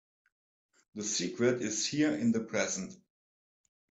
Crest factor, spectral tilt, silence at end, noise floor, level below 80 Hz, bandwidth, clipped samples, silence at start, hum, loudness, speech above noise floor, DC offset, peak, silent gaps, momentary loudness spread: 18 dB; -3.5 dB/octave; 0.95 s; under -90 dBFS; -74 dBFS; 9 kHz; under 0.1%; 0.95 s; none; -32 LUFS; over 58 dB; under 0.1%; -16 dBFS; none; 9 LU